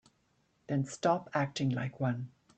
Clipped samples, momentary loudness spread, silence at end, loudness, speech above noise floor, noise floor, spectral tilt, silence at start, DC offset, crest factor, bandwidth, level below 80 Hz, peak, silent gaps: under 0.1%; 5 LU; 0.3 s; -34 LUFS; 41 dB; -74 dBFS; -6.5 dB/octave; 0.7 s; under 0.1%; 18 dB; 9 kHz; -72 dBFS; -16 dBFS; none